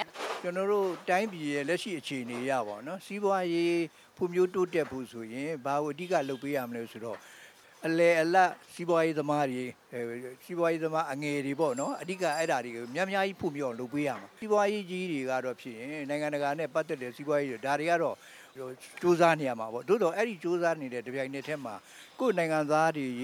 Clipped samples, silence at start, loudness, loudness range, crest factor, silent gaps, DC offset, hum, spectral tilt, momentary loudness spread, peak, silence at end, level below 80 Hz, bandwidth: under 0.1%; 0 s; -31 LUFS; 3 LU; 20 dB; none; under 0.1%; none; -5.5 dB/octave; 13 LU; -10 dBFS; 0 s; -78 dBFS; 16 kHz